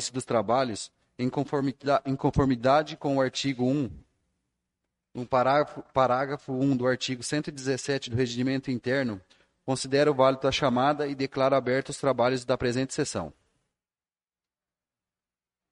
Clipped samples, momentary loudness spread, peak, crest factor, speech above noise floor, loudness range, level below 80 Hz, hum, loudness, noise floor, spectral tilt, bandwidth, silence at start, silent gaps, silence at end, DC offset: under 0.1%; 8 LU; -8 dBFS; 20 dB; over 64 dB; 4 LU; -54 dBFS; none; -27 LUFS; under -90 dBFS; -5.5 dB/octave; 11.5 kHz; 0 s; none; 2.4 s; under 0.1%